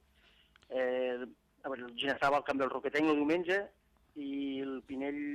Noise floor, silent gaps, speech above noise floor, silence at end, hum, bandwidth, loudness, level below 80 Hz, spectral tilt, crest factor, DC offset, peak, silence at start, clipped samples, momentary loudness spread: -66 dBFS; none; 33 dB; 0 s; none; 12 kHz; -34 LUFS; -70 dBFS; -5 dB/octave; 16 dB; under 0.1%; -18 dBFS; 0.7 s; under 0.1%; 14 LU